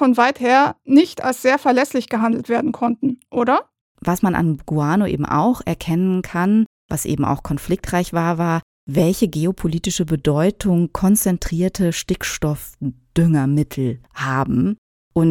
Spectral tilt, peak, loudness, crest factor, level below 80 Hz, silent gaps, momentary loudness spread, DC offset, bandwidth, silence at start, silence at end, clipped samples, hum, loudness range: -6 dB/octave; -2 dBFS; -19 LUFS; 16 dB; -40 dBFS; 3.81-3.95 s, 6.66-6.89 s, 8.62-8.87 s, 14.78-15.11 s; 8 LU; under 0.1%; 17.5 kHz; 0 s; 0 s; under 0.1%; none; 3 LU